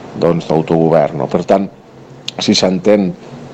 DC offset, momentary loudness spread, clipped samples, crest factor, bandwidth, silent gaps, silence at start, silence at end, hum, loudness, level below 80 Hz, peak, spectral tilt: under 0.1%; 14 LU; under 0.1%; 14 dB; 9 kHz; none; 0 s; 0 s; none; -13 LUFS; -50 dBFS; 0 dBFS; -5.5 dB/octave